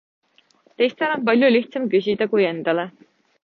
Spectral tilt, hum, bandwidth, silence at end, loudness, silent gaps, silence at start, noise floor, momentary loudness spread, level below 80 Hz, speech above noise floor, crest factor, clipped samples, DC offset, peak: -7.5 dB/octave; none; 6.2 kHz; 0.55 s; -20 LUFS; none; 0.8 s; -58 dBFS; 7 LU; -70 dBFS; 39 dB; 16 dB; under 0.1%; under 0.1%; -6 dBFS